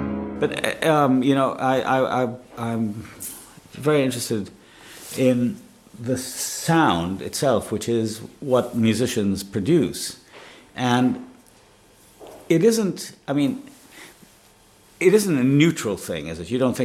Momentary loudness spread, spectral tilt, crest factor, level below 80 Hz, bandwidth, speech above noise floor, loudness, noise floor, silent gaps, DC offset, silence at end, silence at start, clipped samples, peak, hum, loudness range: 15 LU; -5.5 dB/octave; 20 dB; -56 dBFS; 16 kHz; 32 dB; -22 LUFS; -53 dBFS; none; under 0.1%; 0 s; 0 s; under 0.1%; -2 dBFS; none; 3 LU